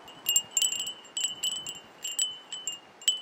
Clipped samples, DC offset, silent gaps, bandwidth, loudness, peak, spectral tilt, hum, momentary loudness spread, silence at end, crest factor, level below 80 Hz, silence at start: under 0.1%; under 0.1%; none; 17 kHz; -29 LUFS; -8 dBFS; 2.5 dB/octave; none; 11 LU; 0 s; 24 dB; -78 dBFS; 0 s